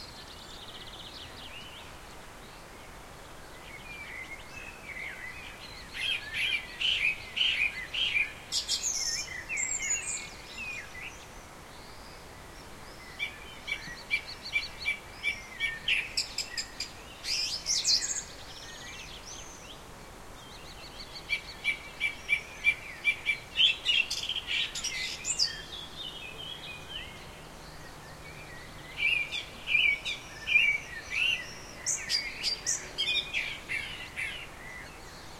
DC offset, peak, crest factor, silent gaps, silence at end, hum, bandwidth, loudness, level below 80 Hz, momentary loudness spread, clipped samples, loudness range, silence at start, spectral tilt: under 0.1%; -12 dBFS; 22 dB; none; 0 s; none; 16.5 kHz; -30 LUFS; -54 dBFS; 21 LU; under 0.1%; 14 LU; 0 s; 0.5 dB/octave